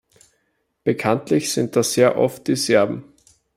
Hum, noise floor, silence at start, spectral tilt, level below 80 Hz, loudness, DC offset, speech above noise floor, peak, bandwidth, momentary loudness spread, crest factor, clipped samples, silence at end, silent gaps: none; -70 dBFS; 0.85 s; -4.5 dB/octave; -62 dBFS; -19 LUFS; under 0.1%; 51 dB; -2 dBFS; 16 kHz; 7 LU; 18 dB; under 0.1%; 0.55 s; none